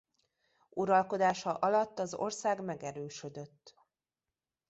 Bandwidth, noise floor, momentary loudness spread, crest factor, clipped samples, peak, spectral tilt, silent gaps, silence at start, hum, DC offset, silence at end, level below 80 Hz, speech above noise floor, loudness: 8.2 kHz; under -90 dBFS; 15 LU; 20 dB; under 0.1%; -14 dBFS; -4.5 dB/octave; none; 0.75 s; none; under 0.1%; 1 s; -78 dBFS; over 57 dB; -33 LUFS